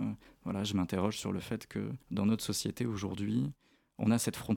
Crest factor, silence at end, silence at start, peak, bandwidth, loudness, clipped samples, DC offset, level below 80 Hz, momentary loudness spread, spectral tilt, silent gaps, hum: 18 dB; 0 s; 0 s; -16 dBFS; 18 kHz; -35 LUFS; under 0.1%; under 0.1%; -62 dBFS; 8 LU; -5.5 dB/octave; none; none